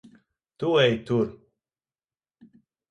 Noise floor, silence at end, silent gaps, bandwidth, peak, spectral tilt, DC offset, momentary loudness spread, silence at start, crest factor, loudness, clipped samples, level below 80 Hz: under -90 dBFS; 1.6 s; none; 9 kHz; -8 dBFS; -6.5 dB/octave; under 0.1%; 10 LU; 0.6 s; 20 dB; -24 LUFS; under 0.1%; -62 dBFS